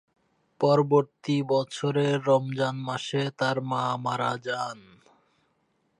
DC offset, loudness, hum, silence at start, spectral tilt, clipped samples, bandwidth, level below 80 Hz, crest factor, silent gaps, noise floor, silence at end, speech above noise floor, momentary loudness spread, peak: under 0.1%; -26 LUFS; none; 0.6 s; -6 dB/octave; under 0.1%; 10.5 kHz; -76 dBFS; 18 dB; none; -71 dBFS; 1.2 s; 46 dB; 8 LU; -8 dBFS